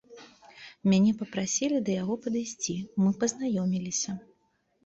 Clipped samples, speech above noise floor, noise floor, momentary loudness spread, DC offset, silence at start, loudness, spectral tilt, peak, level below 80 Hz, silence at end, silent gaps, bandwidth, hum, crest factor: under 0.1%; 44 dB; -71 dBFS; 9 LU; under 0.1%; 0.1 s; -28 LUFS; -5 dB/octave; -14 dBFS; -66 dBFS; 0.65 s; none; 8.2 kHz; none; 16 dB